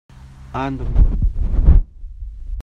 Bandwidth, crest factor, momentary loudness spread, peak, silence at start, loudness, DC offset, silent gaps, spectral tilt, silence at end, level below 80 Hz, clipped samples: 4.1 kHz; 16 dB; 20 LU; 0 dBFS; 0.25 s; -20 LUFS; under 0.1%; none; -9.5 dB/octave; 0 s; -18 dBFS; under 0.1%